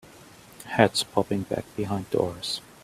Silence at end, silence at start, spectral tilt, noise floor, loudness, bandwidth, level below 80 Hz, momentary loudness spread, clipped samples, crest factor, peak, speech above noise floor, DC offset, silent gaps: 0.25 s; 0.15 s; -4.5 dB/octave; -50 dBFS; -26 LUFS; 15.5 kHz; -58 dBFS; 10 LU; under 0.1%; 26 dB; -2 dBFS; 24 dB; under 0.1%; none